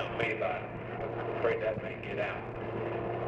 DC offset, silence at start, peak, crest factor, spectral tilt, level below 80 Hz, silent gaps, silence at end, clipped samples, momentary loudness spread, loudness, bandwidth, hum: under 0.1%; 0 s; -16 dBFS; 18 dB; -7.5 dB/octave; -56 dBFS; none; 0 s; under 0.1%; 7 LU; -35 LUFS; 8.2 kHz; none